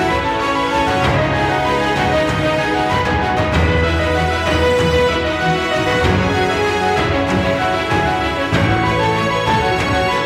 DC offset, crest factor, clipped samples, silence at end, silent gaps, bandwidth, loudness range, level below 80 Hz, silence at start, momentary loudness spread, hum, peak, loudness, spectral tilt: under 0.1%; 14 dB; under 0.1%; 0 s; none; 15.5 kHz; 1 LU; -30 dBFS; 0 s; 2 LU; none; -2 dBFS; -16 LUFS; -5.5 dB/octave